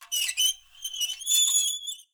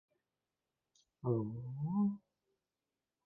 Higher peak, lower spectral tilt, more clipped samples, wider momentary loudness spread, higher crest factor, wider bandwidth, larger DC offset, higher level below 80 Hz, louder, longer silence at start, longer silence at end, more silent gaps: first, -10 dBFS vs -22 dBFS; second, 8 dB/octave vs -13.5 dB/octave; neither; first, 14 LU vs 8 LU; about the same, 16 dB vs 20 dB; first, over 20 kHz vs 6.4 kHz; neither; about the same, -72 dBFS vs -74 dBFS; first, -23 LUFS vs -38 LUFS; second, 0 s vs 1.25 s; second, 0.1 s vs 1.1 s; neither